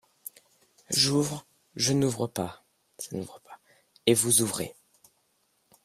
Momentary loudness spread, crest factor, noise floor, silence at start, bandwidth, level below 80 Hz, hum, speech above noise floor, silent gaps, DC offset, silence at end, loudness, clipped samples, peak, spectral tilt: 21 LU; 24 dB; -71 dBFS; 0.9 s; 16 kHz; -66 dBFS; none; 45 dB; none; under 0.1%; 1.1 s; -26 LUFS; under 0.1%; -6 dBFS; -3.5 dB/octave